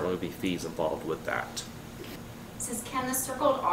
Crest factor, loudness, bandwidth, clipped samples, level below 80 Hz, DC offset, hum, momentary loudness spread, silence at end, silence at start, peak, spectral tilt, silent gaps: 18 dB; -32 LUFS; 16 kHz; under 0.1%; -54 dBFS; under 0.1%; none; 15 LU; 0 s; 0 s; -12 dBFS; -4 dB/octave; none